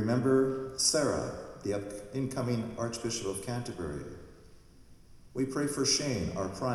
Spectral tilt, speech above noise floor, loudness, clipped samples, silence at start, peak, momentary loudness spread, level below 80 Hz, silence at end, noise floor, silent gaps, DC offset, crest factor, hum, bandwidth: -4 dB/octave; 23 dB; -32 LUFS; under 0.1%; 0 s; -14 dBFS; 12 LU; -56 dBFS; 0 s; -55 dBFS; none; under 0.1%; 18 dB; none; 15.5 kHz